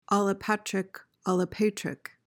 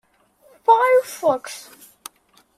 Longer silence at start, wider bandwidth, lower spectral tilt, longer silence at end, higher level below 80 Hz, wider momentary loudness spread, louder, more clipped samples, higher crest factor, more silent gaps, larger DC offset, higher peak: second, 0.1 s vs 0.7 s; first, 17.5 kHz vs 15.5 kHz; first, -5.5 dB/octave vs -2.5 dB/octave; second, 0.35 s vs 0.95 s; first, -64 dBFS vs -72 dBFS; second, 10 LU vs 25 LU; second, -29 LUFS vs -18 LUFS; neither; about the same, 18 dB vs 18 dB; neither; neither; second, -12 dBFS vs -4 dBFS